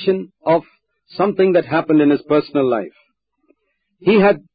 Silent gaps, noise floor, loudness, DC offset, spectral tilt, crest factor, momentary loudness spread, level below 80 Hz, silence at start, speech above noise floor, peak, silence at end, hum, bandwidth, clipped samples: none; -68 dBFS; -16 LUFS; under 0.1%; -12 dB/octave; 14 dB; 8 LU; -60 dBFS; 0 s; 52 dB; -4 dBFS; 0.15 s; none; 5 kHz; under 0.1%